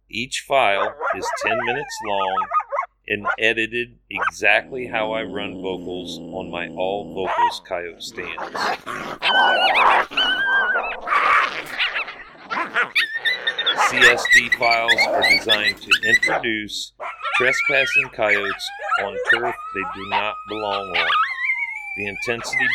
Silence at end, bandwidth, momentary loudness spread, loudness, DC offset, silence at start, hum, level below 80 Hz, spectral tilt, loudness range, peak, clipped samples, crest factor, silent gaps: 0 s; 19 kHz; 13 LU; -19 LUFS; under 0.1%; 0.15 s; none; -54 dBFS; -2 dB/octave; 8 LU; 0 dBFS; under 0.1%; 20 dB; none